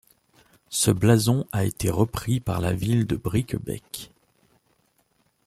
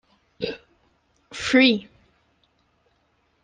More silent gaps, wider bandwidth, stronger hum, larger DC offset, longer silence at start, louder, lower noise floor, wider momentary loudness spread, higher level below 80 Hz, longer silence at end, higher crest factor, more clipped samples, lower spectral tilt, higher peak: neither; first, 15.5 kHz vs 9.6 kHz; neither; neither; first, 0.7 s vs 0.4 s; second, -24 LUFS vs -21 LUFS; about the same, -67 dBFS vs -67 dBFS; second, 14 LU vs 21 LU; first, -48 dBFS vs -62 dBFS; second, 1.4 s vs 1.6 s; about the same, 20 dB vs 22 dB; neither; first, -5.5 dB/octave vs -3.5 dB/octave; about the same, -4 dBFS vs -4 dBFS